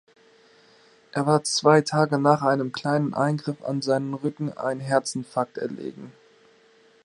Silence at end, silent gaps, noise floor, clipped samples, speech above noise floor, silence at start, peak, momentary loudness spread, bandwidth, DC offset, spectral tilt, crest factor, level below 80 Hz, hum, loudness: 0.95 s; none; -57 dBFS; under 0.1%; 34 dB; 1.15 s; -4 dBFS; 13 LU; 11 kHz; under 0.1%; -5.5 dB/octave; 22 dB; -70 dBFS; none; -24 LUFS